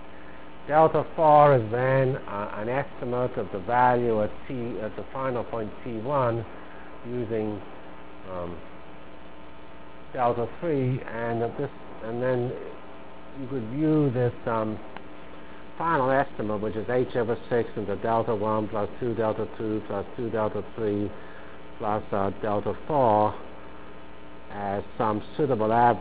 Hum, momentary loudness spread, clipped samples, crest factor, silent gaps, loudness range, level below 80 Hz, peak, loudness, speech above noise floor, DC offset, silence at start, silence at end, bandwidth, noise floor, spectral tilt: none; 23 LU; under 0.1%; 22 dB; none; 9 LU; -52 dBFS; -6 dBFS; -26 LUFS; 21 dB; 1%; 0 s; 0 s; 4 kHz; -46 dBFS; -11 dB/octave